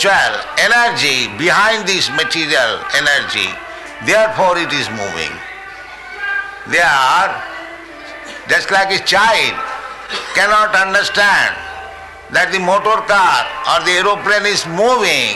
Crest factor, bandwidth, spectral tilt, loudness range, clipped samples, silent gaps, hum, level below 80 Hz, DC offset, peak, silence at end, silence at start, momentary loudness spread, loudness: 12 dB; 12.5 kHz; -2 dB/octave; 4 LU; under 0.1%; none; none; -48 dBFS; under 0.1%; -4 dBFS; 0 s; 0 s; 17 LU; -13 LUFS